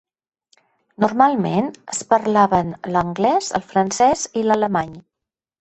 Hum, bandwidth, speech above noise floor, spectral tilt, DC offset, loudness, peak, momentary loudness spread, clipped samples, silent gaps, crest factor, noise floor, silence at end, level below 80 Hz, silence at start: none; 8.6 kHz; 67 dB; -5 dB/octave; under 0.1%; -19 LUFS; 0 dBFS; 7 LU; under 0.1%; none; 18 dB; -85 dBFS; 0.6 s; -52 dBFS; 1 s